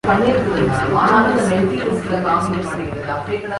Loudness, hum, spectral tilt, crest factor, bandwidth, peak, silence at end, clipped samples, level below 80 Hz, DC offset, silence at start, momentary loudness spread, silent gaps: -17 LUFS; none; -6.5 dB/octave; 16 dB; 11.5 kHz; -2 dBFS; 0 s; under 0.1%; -40 dBFS; under 0.1%; 0.05 s; 10 LU; none